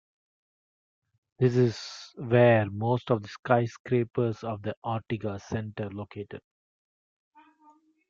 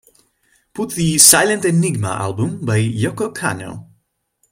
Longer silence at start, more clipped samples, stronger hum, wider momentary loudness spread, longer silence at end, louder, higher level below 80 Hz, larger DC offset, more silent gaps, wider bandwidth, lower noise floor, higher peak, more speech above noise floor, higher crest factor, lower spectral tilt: first, 1.4 s vs 0.75 s; neither; neither; about the same, 18 LU vs 18 LU; first, 1.7 s vs 0.7 s; second, -27 LUFS vs -15 LUFS; second, -66 dBFS vs -52 dBFS; neither; first, 3.39-3.43 s, 3.80-3.84 s, 4.77-4.82 s vs none; second, 7.4 kHz vs 16.5 kHz; second, -61 dBFS vs -65 dBFS; second, -6 dBFS vs 0 dBFS; second, 34 dB vs 49 dB; about the same, 22 dB vs 18 dB; first, -7.5 dB/octave vs -3.5 dB/octave